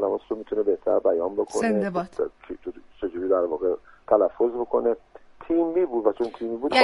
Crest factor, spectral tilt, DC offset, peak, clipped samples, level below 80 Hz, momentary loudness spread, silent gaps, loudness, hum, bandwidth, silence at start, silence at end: 20 dB; -5.5 dB/octave; under 0.1%; -4 dBFS; under 0.1%; -58 dBFS; 11 LU; none; -25 LUFS; none; 11.5 kHz; 0 s; 0 s